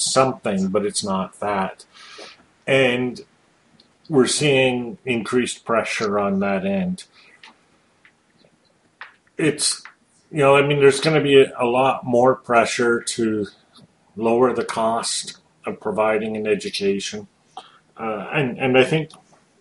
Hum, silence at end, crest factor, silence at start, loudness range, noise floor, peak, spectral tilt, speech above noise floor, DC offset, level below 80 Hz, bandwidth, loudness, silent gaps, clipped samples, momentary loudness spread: none; 0.55 s; 20 dB; 0 s; 8 LU; -60 dBFS; -2 dBFS; -4 dB/octave; 41 dB; under 0.1%; -60 dBFS; 11.5 kHz; -20 LUFS; none; under 0.1%; 16 LU